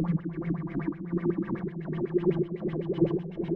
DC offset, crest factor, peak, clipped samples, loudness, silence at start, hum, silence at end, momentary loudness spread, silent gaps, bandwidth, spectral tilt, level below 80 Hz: under 0.1%; 18 dB; -12 dBFS; under 0.1%; -30 LUFS; 0 s; none; 0 s; 6 LU; none; 4.2 kHz; -11.5 dB/octave; -54 dBFS